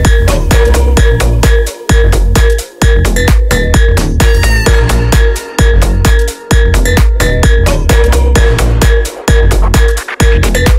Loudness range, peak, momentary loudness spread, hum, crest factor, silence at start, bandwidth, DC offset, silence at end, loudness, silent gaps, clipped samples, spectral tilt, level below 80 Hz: 0 LU; 0 dBFS; 3 LU; none; 6 dB; 0 s; 16 kHz; under 0.1%; 0 s; -10 LUFS; none; 0.5%; -5 dB/octave; -8 dBFS